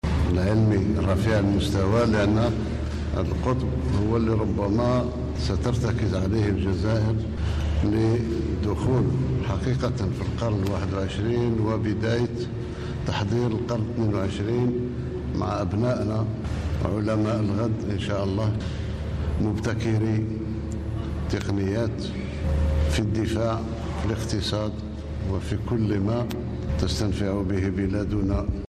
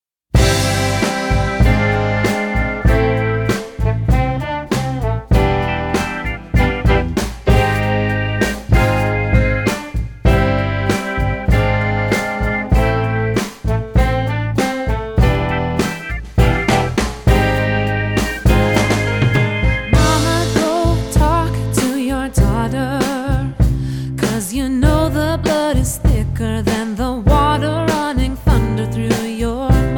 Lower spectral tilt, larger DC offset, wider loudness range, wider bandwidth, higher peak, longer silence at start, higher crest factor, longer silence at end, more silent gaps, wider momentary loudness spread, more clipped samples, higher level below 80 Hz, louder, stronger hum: first, -7.5 dB/octave vs -6 dB/octave; neither; about the same, 3 LU vs 2 LU; second, 11.5 kHz vs 19 kHz; second, -10 dBFS vs 0 dBFS; second, 0.05 s vs 0.35 s; about the same, 14 dB vs 14 dB; about the same, 0.05 s vs 0 s; neither; about the same, 7 LU vs 6 LU; neither; second, -34 dBFS vs -22 dBFS; second, -25 LUFS vs -17 LUFS; neither